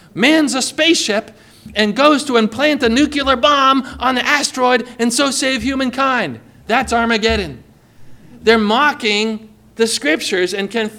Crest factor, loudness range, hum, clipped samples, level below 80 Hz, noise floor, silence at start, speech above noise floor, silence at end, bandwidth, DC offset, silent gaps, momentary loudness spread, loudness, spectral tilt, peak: 16 dB; 3 LU; none; under 0.1%; -40 dBFS; -38 dBFS; 0.15 s; 23 dB; 0 s; 16.5 kHz; under 0.1%; none; 7 LU; -15 LUFS; -3 dB/octave; 0 dBFS